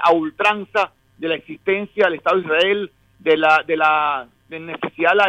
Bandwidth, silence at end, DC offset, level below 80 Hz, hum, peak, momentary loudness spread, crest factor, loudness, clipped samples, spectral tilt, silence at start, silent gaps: 10 kHz; 0 s; under 0.1%; -62 dBFS; none; -2 dBFS; 13 LU; 16 dB; -19 LUFS; under 0.1%; -5 dB/octave; 0 s; none